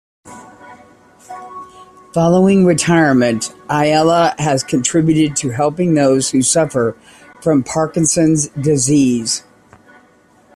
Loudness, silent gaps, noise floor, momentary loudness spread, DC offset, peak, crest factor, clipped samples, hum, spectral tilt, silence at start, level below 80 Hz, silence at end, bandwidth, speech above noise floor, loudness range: -14 LUFS; none; -50 dBFS; 10 LU; under 0.1%; -2 dBFS; 14 dB; under 0.1%; none; -5 dB/octave; 0.25 s; -50 dBFS; 1.15 s; 13 kHz; 36 dB; 3 LU